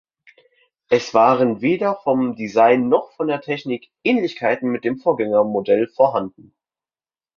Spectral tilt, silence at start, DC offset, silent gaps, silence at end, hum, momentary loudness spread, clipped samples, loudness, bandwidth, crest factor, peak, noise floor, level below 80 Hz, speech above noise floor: -6.5 dB/octave; 0.9 s; under 0.1%; none; 1.1 s; none; 9 LU; under 0.1%; -19 LUFS; 7.2 kHz; 18 dB; -2 dBFS; under -90 dBFS; -64 dBFS; over 72 dB